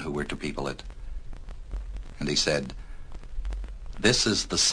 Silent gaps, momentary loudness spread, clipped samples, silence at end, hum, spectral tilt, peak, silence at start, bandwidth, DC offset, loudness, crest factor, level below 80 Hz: none; 23 LU; under 0.1%; 0 s; none; -2.5 dB/octave; -6 dBFS; 0 s; 10.5 kHz; under 0.1%; -26 LUFS; 22 dB; -38 dBFS